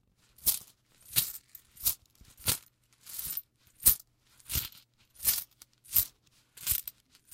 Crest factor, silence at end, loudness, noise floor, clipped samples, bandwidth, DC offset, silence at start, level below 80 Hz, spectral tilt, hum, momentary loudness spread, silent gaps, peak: 28 dB; 0.45 s; -30 LUFS; -63 dBFS; under 0.1%; 17 kHz; under 0.1%; 0.4 s; -54 dBFS; -0.5 dB/octave; none; 16 LU; none; -6 dBFS